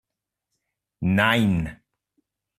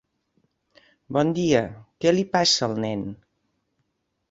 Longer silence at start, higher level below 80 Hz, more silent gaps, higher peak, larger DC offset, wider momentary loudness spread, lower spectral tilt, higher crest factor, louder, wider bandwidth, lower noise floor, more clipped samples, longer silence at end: about the same, 1 s vs 1.1 s; first, -50 dBFS vs -58 dBFS; neither; about the same, -6 dBFS vs -6 dBFS; neither; about the same, 11 LU vs 12 LU; first, -6.5 dB/octave vs -4.5 dB/octave; about the same, 20 dB vs 20 dB; about the same, -22 LUFS vs -22 LUFS; first, 14.5 kHz vs 8 kHz; first, -84 dBFS vs -75 dBFS; neither; second, 0.85 s vs 1.15 s